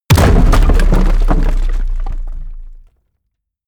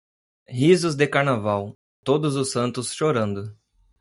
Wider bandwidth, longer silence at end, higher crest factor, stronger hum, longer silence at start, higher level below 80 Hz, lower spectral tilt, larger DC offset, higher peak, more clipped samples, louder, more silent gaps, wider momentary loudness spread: first, 14.5 kHz vs 11.5 kHz; first, 0.9 s vs 0.55 s; second, 10 dB vs 20 dB; neither; second, 0.1 s vs 0.5 s; first, -12 dBFS vs -64 dBFS; about the same, -6 dB/octave vs -5.5 dB/octave; neither; first, 0 dBFS vs -4 dBFS; neither; first, -14 LUFS vs -22 LUFS; second, none vs 1.75-2.03 s; first, 19 LU vs 15 LU